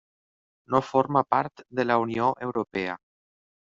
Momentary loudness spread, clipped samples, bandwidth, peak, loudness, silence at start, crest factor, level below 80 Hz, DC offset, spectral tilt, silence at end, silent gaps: 8 LU; under 0.1%; 7.6 kHz; -4 dBFS; -26 LUFS; 0.7 s; 24 dB; -64 dBFS; under 0.1%; -5 dB/octave; 0.75 s; none